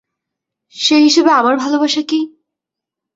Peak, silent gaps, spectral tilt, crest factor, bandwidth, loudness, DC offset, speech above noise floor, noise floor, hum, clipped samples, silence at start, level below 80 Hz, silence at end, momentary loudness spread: 0 dBFS; none; -1.5 dB/octave; 14 dB; 7.8 kHz; -13 LUFS; under 0.1%; 71 dB; -83 dBFS; none; under 0.1%; 0.75 s; -64 dBFS; 0.9 s; 10 LU